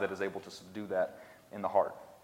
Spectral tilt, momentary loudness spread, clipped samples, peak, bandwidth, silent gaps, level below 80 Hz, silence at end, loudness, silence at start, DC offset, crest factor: -5.5 dB/octave; 15 LU; under 0.1%; -14 dBFS; 16 kHz; none; -76 dBFS; 0.05 s; -36 LUFS; 0 s; under 0.1%; 22 dB